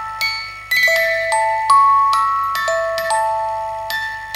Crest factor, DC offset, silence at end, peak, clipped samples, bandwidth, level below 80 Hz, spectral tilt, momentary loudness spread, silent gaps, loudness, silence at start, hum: 14 dB; under 0.1%; 0 s; -2 dBFS; under 0.1%; 16.5 kHz; -50 dBFS; 0 dB/octave; 10 LU; none; -16 LUFS; 0 s; 50 Hz at -50 dBFS